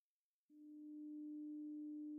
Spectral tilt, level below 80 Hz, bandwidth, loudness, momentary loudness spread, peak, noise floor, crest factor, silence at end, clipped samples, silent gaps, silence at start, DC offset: 10 dB/octave; under -90 dBFS; 0.9 kHz; -53 LUFS; 10 LU; -46 dBFS; under -90 dBFS; 6 dB; 0 s; under 0.1%; none; 0.5 s; under 0.1%